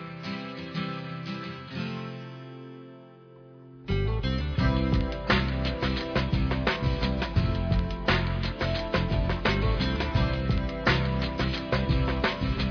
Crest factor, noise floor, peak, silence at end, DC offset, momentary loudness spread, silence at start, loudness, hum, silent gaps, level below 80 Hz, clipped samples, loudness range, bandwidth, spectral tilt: 18 dB; -50 dBFS; -10 dBFS; 0 s; under 0.1%; 11 LU; 0 s; -28 LUFS; none; none; -34 dBFS; under 0.1%; 9 LU; 5.4 kHz; -7 dB/octave